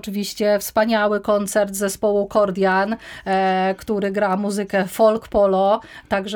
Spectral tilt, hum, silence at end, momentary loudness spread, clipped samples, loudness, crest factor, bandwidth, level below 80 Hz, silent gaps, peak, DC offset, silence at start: -5 dB/octave; none; 0 s; 6 LU; under 0.1%; -20 LUFS; 14 dB; over 20 kHz; -50 dBFS; none; -4 dBFS; under 0.1%; 0.05 s